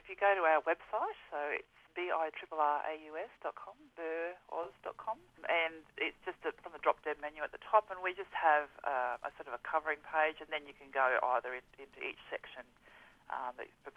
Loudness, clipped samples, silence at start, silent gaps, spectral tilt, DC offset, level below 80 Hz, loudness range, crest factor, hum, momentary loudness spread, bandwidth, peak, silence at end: -36 LUFS; under 0.1%; 0.05 s; none; -4 dB/octave; under 0.1%; -74 dBFS; 5 LU; 24 dB; none; 14 LU; 7.8 kHz; -14 dBFS; 0.05 s